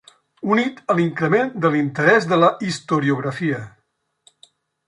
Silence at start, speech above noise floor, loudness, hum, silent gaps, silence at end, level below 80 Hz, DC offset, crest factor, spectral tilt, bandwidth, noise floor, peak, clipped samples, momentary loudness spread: 0.45 s; 51 dB; -19 LUFS; none; none; 1.2 s; -64 dBFS; under 0.1%; 18 dB; -6.5 dB/octave; 11.5 kHz; -70 dBFS; -2 dBFS; under 0.1%; 9 LU